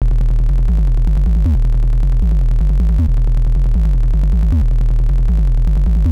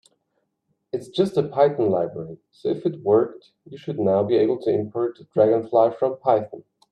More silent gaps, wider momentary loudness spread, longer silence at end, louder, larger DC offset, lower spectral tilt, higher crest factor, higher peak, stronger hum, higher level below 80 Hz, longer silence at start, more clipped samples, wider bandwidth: neither; second, 2 LU vs 13 LU; second, 0 s vs 0.3 s; first, -16 LUFS vs -22 LUFS; neither; about the same, -9 dB/octave vs -8 dB/octave; second, 4 dB vs 18 dB; about the same, -8 dBFS vs -6 dBFS; neither; first, -12 dBFS vs -70 dBFS; second, 0 s vs 0.95 s; neither; second, 2.6 kHz vs 10.5 kHz